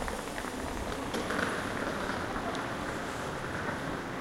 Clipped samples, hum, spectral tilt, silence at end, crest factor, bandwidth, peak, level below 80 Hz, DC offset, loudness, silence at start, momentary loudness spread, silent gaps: under 0.1%; none; -4.5 dB/octave; 0 s; 18 dB; 16.5 kHz; -16 dBFS; -48 dBFS; under 0.1%; -35 LUFS; 0 s; 5 LU; none